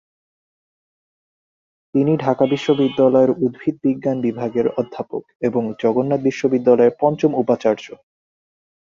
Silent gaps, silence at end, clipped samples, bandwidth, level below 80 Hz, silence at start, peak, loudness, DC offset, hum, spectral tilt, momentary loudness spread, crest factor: 5.35-5.40 s; 1.1 s; under 0.1%; 7.4 kHz; -62 dBFS; 1.95 s; -2 dBFS; -18 LUFS; under 0.1%; none; -7.5 dB/octave; 9 LU; 18 dB